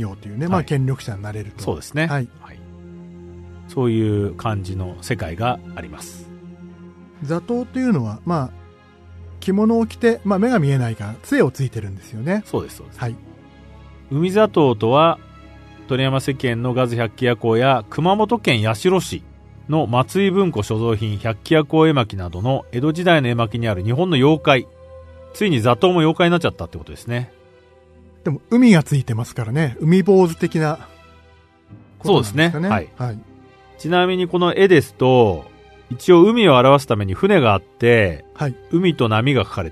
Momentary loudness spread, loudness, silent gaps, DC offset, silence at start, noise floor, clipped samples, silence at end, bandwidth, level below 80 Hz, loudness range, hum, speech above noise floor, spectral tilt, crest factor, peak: 15 LU; -18 LUFS; none; under 0.1%; 0 s; -50 dBFS; under 0.1%; 0 s; 13.5 kHz; -48 dBFS; 10 LU; none; 33 dB; -6.5 dB/octave; 18 dB; 0 dBFS